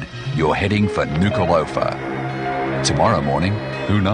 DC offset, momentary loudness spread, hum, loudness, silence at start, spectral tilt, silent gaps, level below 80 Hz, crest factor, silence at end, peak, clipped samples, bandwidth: under 0.1%; 7 LU; none; -19 LUFS; 0 s; -5.5 dB/octave; none; -38 dBFS; 16 dB; 0 s; -4 dBFS; under 0.1%; 10.5 kHz